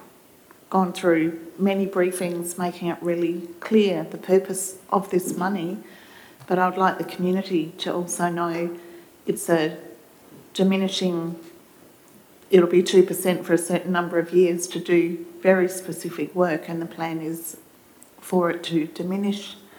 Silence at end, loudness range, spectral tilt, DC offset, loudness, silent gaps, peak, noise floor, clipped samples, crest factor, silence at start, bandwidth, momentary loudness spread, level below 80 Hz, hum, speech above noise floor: 0.2 s; 5 LU; -5.5 dB/octave; under 0.1%; -23 LUFS; none; -4 dBFS; -52 dBFS; under 0.1%; 20 dB; 0 s; over 20 kHz; 12 LU; -74 dBFS; none; 29 dB